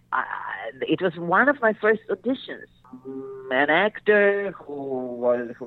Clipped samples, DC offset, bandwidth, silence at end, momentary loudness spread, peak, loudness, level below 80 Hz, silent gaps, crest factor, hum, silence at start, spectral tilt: under 0.1%; under 0.1%; 4.5 kHz; 0 s; 17 LU; -8 dBFS; -23 LUFS; -66 dBFS; none; 16 dB; none; 0.1 s; -8 dB/octave